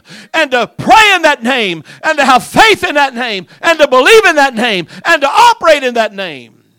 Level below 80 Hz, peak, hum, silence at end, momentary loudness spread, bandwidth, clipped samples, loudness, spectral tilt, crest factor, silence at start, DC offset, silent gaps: -42 dBFS; 0 dBFS; none; 0.35 s; 11 LU; over 20 kHz; 4%; -9 LUFS; -2.5 dB/octave; 10 dB; 0.1 s; under 0.1%; none